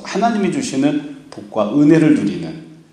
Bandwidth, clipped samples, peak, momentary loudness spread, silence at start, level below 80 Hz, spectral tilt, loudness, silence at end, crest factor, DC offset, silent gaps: 10.5 kHz; under 0.1%; 0 dBFS; 20 LU; 0 s; -58 dBFS; -6.5 dB/octave; -16 LUFS; 0.2 s; 16 dB; under 0.1%; none